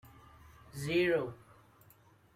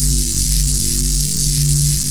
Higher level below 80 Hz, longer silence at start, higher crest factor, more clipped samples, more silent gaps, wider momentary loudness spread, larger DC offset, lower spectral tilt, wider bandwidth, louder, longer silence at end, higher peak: second, -64 dBFS vs -20 dBFS; about the same, 0.05 s vs 0 s; about the same, 18 dB vs 16 dB; neither; neither; first, 21 LU vs 2 LU; neither; first, -5.5 dB/octave vs -3 dB/octave; second, 15 kHz vs over 20 kHz; second, -33 LUFS vs -15 LUFS; first, 1 s vs 0 s; second, -18 dBFS vs 0 dBFS